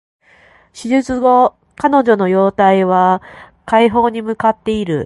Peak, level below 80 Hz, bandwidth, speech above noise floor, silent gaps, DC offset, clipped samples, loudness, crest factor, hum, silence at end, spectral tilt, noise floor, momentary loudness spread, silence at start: 0 dBFS; -48 dBFS; 11.5 kHz; 35 dB; none; under 0.1%; under 0.1%; -14 LUFS; 14 dB; none; 0 s; -6.5 dB/octave; -48 dBFS; 7 LU; 0.75 s